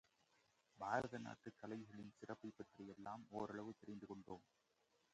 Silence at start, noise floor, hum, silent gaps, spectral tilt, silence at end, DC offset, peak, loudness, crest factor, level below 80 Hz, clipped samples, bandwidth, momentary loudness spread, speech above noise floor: 0.75 s; -81 dBFS; none; none; -6 dB/octave; 0.7 s; under 0.1%; -26 dBFS; -52 LUFS; 26 dB; -82 dBFS; under 0.1%; 8.8 kHz; 13 LU; 29 dB